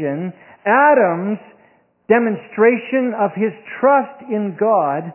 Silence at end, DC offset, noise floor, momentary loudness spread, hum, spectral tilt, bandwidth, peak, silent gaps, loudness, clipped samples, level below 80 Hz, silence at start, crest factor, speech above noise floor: 0 s; under 0.1%; -55 dBFS; 12 LU; none; -10.5 dB/octave; 3.1 kHz; -2 dBFS; none; -17 LUFS; under 0.1%; -72 dBFS; 0 s; 16 dB; 38 dB